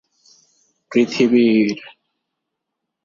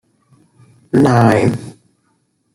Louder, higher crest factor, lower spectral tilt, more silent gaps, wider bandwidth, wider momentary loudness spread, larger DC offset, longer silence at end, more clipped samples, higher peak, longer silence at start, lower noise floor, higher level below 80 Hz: second, -16 LUFS vs -13 LUFS; about the same, 16 dB vs 14 dB; second, -6 dB/octave vs -7.5 dB/octave; neither; second, 7.4 kHz vs 15 kHz; second, 8 LU vs 16 LU; neither; first, 1.15 s vs 0.85 s; neither; about the same, -4 dBFS vs -2 dBFS; about the same, 0.9 s vs 0.95 s; first, -79 dBFS vs -63 dBFS; second, -64 dBFS vs -52 dBFS